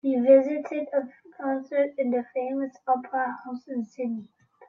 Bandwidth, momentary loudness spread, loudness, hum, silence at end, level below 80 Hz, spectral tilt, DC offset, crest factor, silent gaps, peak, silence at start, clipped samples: 6.6 kHz; 15 LU; -26 LUFS; none; 0.05 s; -78 dBFS; -7.5 dB/octave; under 0.1%; 18 dB; none; -8 dBFS; 0.05 s; under 0.1%